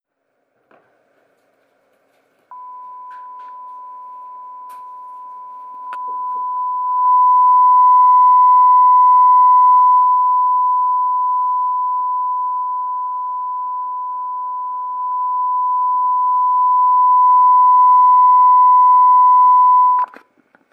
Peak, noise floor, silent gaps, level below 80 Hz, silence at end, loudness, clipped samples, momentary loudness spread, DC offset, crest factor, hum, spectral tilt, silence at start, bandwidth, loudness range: -6 dBFS; -69 dBFS; none; under -90 dBFS; 0.7 s; -12 LUFS; under 0.1%; 25 LU; under 0.1%; 8 dB; none; -3.5 dB/octave; 2.5 s; 2.1 kHz; 16 LU